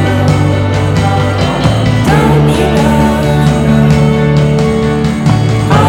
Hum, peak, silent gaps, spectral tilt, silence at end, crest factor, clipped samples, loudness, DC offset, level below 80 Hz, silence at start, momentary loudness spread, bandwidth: none; 0 dBFS; none; -7 dB/octave; 0 s; 8 dB; 0.1%; -10 LUFS; under 0.1%; -24 dBFS; 0 s; 3 LU; 16 kHz